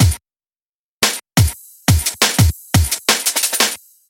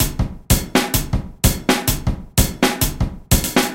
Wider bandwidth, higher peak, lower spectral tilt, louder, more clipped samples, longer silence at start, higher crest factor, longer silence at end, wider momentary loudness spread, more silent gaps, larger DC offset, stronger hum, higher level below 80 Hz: about the same, 17 kHz vs 17.5 kHz; about the same, -2 dBFS vs 0 dBFS; about the same, -3 dB/octave vs -4 dB/octave; first, -16 LUFS vs -19 LUFS; neither; about the same, 0 s vs 0 s; about the same, 16 dB vs 18 dB; first, 0.35 s vs 0 s; about the same, 4 LU vs 6 LU; first, 0.61-1.00 s vs none; neither; neither; about the same, -28 dBFS vs -24 dBFS